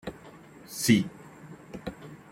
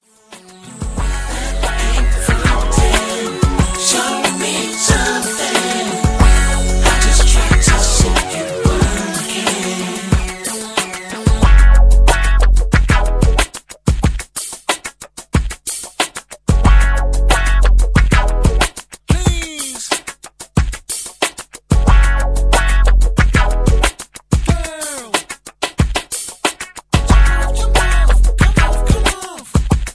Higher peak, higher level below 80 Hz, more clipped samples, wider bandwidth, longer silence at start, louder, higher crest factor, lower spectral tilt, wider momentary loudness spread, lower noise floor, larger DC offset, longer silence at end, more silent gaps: second, -8 dBFS vs 0 dBFS; second, -58 dBFS vs -14 dBFS; neither; first, 16.5 kHz vs 11 kHz; second, 0.05 s vs 0.3 s; second, -27 LUFS vs -15 LUFS; first, 22 dB vs 14 dB; about the same, -4.5 dB/octave vs -4 dB/octave; first, 25 LU vs 10 LU; first, -50 dBFS vs -41 dBFS; neither; first, 0.15 s vs 0 s; neither